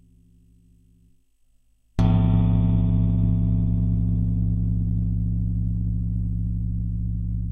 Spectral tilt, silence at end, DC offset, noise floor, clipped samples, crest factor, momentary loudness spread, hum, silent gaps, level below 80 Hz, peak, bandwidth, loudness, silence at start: -11 dB/octave; 0 s; under 0.1%; -60 dBFS; under 0.1%; 16 dB; 8 LU; none; none; -28 dBFS; -8 dBFS; 3.7 kHz; -23 LUFS; 1.95 s